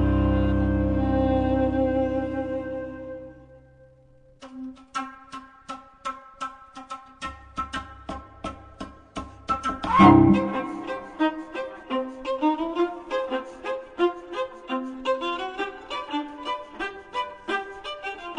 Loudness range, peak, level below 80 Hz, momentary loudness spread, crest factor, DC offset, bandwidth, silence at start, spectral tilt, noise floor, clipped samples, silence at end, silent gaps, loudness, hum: 16 LU; -2 dBFS; -38 dBFS; 17 LU; 24 dB; under 0.1%; 10 kHz; 0 s; -7.5 dB/octave; -55 dBFS; under 0.1%; 0 s; none; -26 LUFS; none